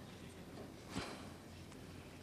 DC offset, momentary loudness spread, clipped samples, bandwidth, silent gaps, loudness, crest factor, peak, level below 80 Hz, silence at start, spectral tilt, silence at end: under 0.1%; 8 LU; under 0.1%; 15 kHz; none; -51 LUFS; 22 dB; -28 dBFS; -66 dBFS; 0 s; -4.5 dB/octave; 0 s